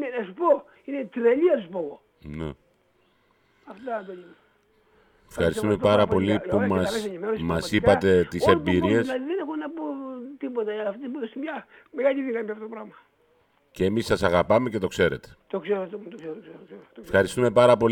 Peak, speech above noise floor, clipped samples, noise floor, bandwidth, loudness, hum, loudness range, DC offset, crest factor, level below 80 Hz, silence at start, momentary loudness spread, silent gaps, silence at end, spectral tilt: -4 dBFS; 41 dB; under 0.1%; -65 dBFS; 18 kHz; -24 LUFS; none; 9 LU; under 0.1%; 20 dB; -52 dBFS; 0 s; 18 LU; none; 0 s; -6.5 dB/octave